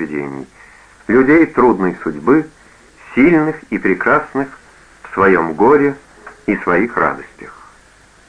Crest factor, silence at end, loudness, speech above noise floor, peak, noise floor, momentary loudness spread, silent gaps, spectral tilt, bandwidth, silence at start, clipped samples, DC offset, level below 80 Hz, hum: 16 dB; 0.8 s; -14 LUFS; 33 dB; 0 dBFS; -47 dBFS; 16 LU; none; -8 dB/octave; 10 kHz; 0 s; under 0.1%; under 0.1%; -46 dBFS; none